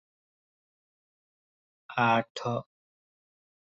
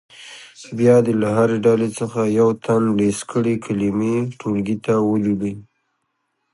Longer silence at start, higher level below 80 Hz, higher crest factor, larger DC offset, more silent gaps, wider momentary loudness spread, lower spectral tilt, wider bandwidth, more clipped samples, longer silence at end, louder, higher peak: first, 1.9 s vs 0.2 s; second, -74 dBFS vs -54 dBFS; about the same, 22 dB vs 18 dB; neither; first, 2.30-2.35 s vs none; second, 11 LU vs 15 LU; about the same, -6 dB/octave vs -7 dB/octave; second, 8 kHz vs 11.5 kHz; neither; about the same, 1 s vs 0.9 s; second, -29 LUFS vs -19 LUFS; second, -12 dBFS vs -2 dBFS